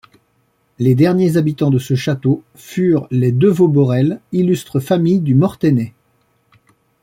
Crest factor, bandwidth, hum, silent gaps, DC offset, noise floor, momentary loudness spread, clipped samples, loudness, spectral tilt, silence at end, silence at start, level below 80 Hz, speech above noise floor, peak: 14 dB; 16 kHz; none; none; under 0.1%; -61 dBFS; 6 LU; under 0.1%; -15 LUFS; -8 dB/octave; 1.15 s; 0.8 s; -54 dBFS; 47 dB; -2 dBFS